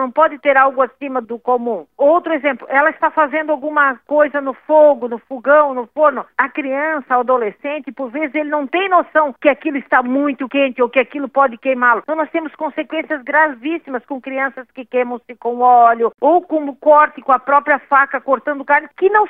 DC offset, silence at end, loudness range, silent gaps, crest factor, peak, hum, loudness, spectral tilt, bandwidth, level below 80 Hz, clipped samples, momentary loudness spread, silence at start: under 0.1%; 0 s; 4 LU; none; 16 dB; 0 dBFS; none; -16 LUFS; -7 dB/octave; 3.9 kHz; -68 dBFS; under 0.1%; 11 LU; 0 s